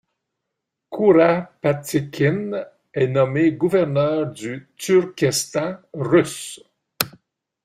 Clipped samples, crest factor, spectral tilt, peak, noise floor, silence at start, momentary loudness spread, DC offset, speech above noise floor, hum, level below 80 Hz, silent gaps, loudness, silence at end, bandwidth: under 0.1%; 20 dB; -5.5 dB/octave; 0 dBFS; -81 dBFS; 0.9 s; 14 LU; under 0.1%; 61 dB; none; -60 dBFS; none; -20 LUFS; 0.55 s; 16 kHz